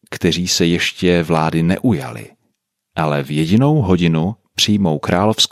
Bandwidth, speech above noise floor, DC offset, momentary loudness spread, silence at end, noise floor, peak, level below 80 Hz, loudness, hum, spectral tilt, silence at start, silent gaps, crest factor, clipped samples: 14.5 kHz; 54 dB; under 0.1%; 8 LU; 0.05 s; -69 dBFS; -2 dBFS; -46 dBFS; -16 LUFS; none; -5 dB/octave; 0.1 s; none; 14 dB; under 0.1%